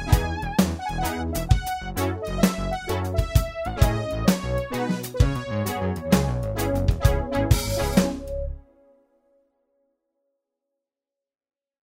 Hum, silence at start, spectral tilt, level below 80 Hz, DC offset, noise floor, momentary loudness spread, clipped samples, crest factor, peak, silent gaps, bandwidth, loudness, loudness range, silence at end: none; 0 s; -6 dB/octave; -30 dBFS; under 0.1%; -90 dBFS; 6 LU; under 0.1%; 20 dB; -4 dBFS; none; 16.5 kHz; -25 LUFS; 5 LU; 3.25 s